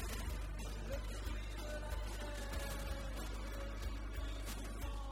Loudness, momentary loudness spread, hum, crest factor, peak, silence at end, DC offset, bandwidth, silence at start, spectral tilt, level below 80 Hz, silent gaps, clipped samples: -46 LUFS; 2 LU; none; 12 dB; -30 dBFS; 0 s; under 0.1%; 16 kHz; 0 s; -4.5 dB/octave; -44 dBFS; none; under 0.1%